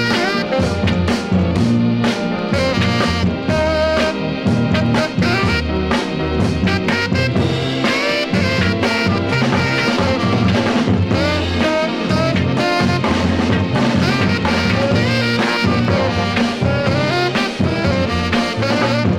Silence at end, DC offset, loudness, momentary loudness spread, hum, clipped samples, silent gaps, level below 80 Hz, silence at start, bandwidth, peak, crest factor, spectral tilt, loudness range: 0 s; under 0.1%; -16 LUFS; 2 LU; none; under 0.1%; none; -34 dBFS; 0 s; 15 kHz; -2 dBFS; 14 dB; -6 dB/octave; 1 LU